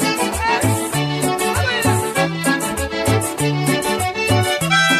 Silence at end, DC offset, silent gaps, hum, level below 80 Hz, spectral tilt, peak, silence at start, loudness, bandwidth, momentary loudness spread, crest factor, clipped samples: 0 s; under 0.1%; none; none; -38 dBFS; -4 dB/octave; -2 dBFS; 0 s; -18 LUFS; 15.5 kHz; 3 LU; 16 dB; under 0.1%